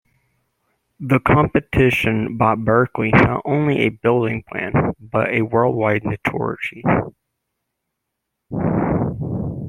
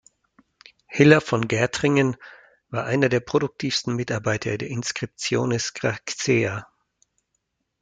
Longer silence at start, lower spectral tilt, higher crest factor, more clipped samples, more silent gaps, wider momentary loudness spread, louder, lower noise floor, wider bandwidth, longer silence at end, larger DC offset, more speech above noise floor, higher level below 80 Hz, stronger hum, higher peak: about the same, 1 s vs 0.9 s; first, -8 dB/octave vs -5 dB/octave; about the same, 18 dB vs 22 dB; neither; neither; about the same, 9 LU vs 10 LU; first, -18 LUFS vs -23 LUFS; about the same, -78 dBFS vs -76 dBFS; first, 16 kHz vs 9.4 kHz; second, 0 s vs 1.15 s; neither; first, 60 dB vs 53 dB; first, -42 dBFS vs -60 dBFS; neither; about the same, -2 dBFS vs -2 dBFS